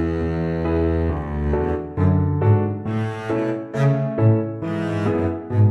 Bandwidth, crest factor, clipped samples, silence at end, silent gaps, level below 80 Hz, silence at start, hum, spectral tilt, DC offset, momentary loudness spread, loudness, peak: 6.4 kHz; 14 dB; under 0.1%; 0 s; none; -34 dBFS; 0 s; none; -9.5 dB/octave; under 0.1%; 6 LU; -21 LUFS; -6 dBFS